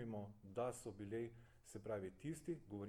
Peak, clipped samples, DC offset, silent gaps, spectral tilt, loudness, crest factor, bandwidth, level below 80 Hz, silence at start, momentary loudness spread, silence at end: -32 dBFS; under 0.1%; under 0.1%; none; -6.5 dB/octave; -50 LUFS; 18 dB; 19 kHz; -72 dBFS; 0 s; 8 LU; 0 s